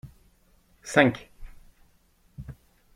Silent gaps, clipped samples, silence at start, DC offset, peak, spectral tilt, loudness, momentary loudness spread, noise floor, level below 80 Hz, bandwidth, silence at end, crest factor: none; under 0.1%; 0.05 s; under 0.1%; -2 dBFS; -5 dB/octave; -23 LUFS; 24 LU; -63 dBFS; -52 dBFS; 15.5 kHz; 0.45 s; 28 dB